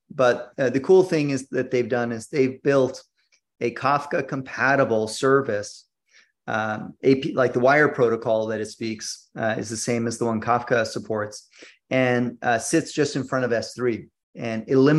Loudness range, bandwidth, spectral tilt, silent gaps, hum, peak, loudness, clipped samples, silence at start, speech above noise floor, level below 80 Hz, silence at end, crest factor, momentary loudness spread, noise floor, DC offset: 2 LU; 12.5 kHz; -5.5 dB/octave; 14.23-14.33 s; none; -6 dBFS; -23 LUFS; under 0.1%; 0.15 s; 37 dB; -66 dBFS; 0 s; 18 dB; 12 LU; -60 dBFS; under 0.1%